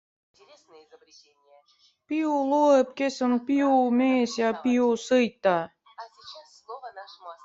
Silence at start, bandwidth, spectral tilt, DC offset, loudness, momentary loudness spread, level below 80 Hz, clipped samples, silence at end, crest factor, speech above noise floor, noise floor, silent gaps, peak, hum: 2.1 s; 7.8 kHz; -5 dB/octave; under 0.1%; -24 LUFS; 22 LU; -74 dBFS; under 0.1%; 0.1 s; 16 dB; 23 dB; -48 dBFS; none; -10 dBFS; none